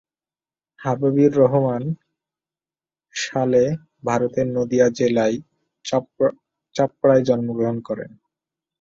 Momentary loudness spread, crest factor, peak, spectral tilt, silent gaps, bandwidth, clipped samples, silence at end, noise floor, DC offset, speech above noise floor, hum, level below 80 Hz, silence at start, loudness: 14 LU; 18 dB; -4 dBFS; -6.5 dB/octave; none; 7.8 kHz; under 0.1%; 0.75 s; under -90 dBFS; under 0.1%; over 71 dB; none; -60 dBFS; 0.8 s; -20 LUFS